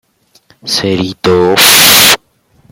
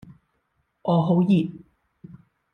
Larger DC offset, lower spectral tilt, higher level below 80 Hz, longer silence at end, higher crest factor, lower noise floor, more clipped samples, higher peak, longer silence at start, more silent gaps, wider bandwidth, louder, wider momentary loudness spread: neither; second, -1.5 dB/octave vs -10 dB/octave; first, -46 dBFS vs -64 dBFS; first, 0.55 s vs 0.4 s; second, 10 dB vs 16 dB; second, -50 dBFS vs -72 dBFS; first, 2% vs under 0.1%; first, 0 dBFS vs -8 dBFS; second, 0.65 s vs 0.85 s; neither; first, over 20 kHz vs 4.3 kHz; first, -6 LUFS vs -22 LUFS; about the same, 13 LU vs 13 LU